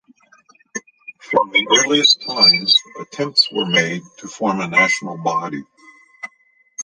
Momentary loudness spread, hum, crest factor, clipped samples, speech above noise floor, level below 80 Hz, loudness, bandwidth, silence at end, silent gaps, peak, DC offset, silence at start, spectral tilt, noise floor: 23 LU; none; 18 dB; under 0.1%; 40 dB; -68 dBFS; -15 LUFS; 10 kHz; 0 s; none; 0 dBFS; under 0.1%; 0.75 s; -2 dB/octave; -58 dBFS